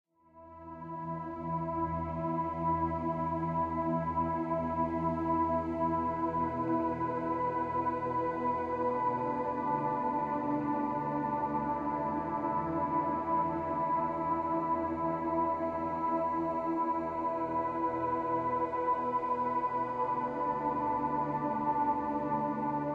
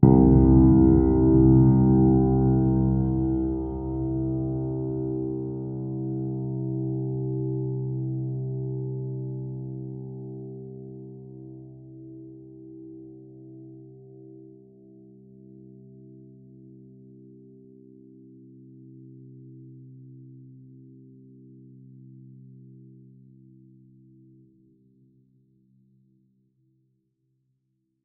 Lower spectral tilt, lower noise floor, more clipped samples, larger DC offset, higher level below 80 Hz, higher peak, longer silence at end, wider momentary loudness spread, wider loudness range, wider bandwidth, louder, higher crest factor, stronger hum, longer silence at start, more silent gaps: second, -9.5 dB/octave vs -15.5 dB/octave; second, -56 dBFS vs -75 dBFS; neither; neither; second, -56 dBFS vs -38 dBFS; second, -20 dBFS vs -2 dBFS; second, 0 s vs 7.65 s; second, 2 LU vs 29 LU; second, 1 LU vs 29 LU; first, 7 kHz vs 2.1 kHz; second, -33 LUFS vs -23 LUFS; second, 12 dB vs 24 dB; neither; first, 0.35 s vs 0 s; neither